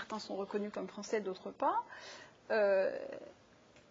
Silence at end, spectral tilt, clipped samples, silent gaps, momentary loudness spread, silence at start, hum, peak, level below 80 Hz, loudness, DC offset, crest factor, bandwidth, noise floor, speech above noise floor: 0.1 s; -3 dB/octave; under 0.1%; none; 19 LU; 0 s; none; -22 dBFS; -80 dBFS; -36 LUFS; under 0.1%; 16 dB; 7.6 kHz; -63 dBFS; 26 dB